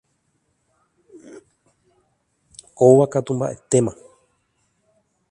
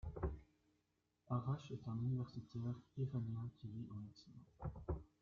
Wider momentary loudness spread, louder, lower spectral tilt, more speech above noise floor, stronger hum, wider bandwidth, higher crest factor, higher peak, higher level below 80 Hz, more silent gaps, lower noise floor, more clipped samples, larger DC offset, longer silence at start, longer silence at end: about the same, 12 LU vs 11 LU; first, -18 LUFS vs -47 LUFS; second, -7 dB/octave vs -9 dB/octave; first, 52 dB vs 39 dB; neither; first, 11 kHz vs 7 kHz; about the same, 22 dB vs 18 dB; first, 0 dBFS vs -30 dBFS; about the same, -60 dBFS vs -58 dBFS; neither; second, -69 dBFS vs -85 dBFS; neither; neither; first, 1.35 s vs 0.05 s; first, 1.4 s vs 0.15 s